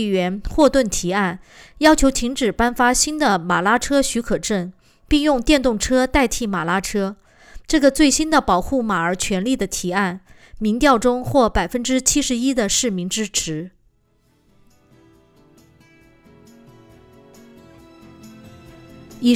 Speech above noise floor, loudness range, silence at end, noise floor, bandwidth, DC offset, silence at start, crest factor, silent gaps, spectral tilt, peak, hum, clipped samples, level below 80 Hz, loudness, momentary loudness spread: 42 dB; 6 LU; 0 s; -61 dBFS; 19.5 kHz; under 0.1%; 0 s; 18 dB; none; -3.5 dB/octave; -2 dBFS; none; under 0.1%; -36 dBFS; -18 LUFS; 8 LU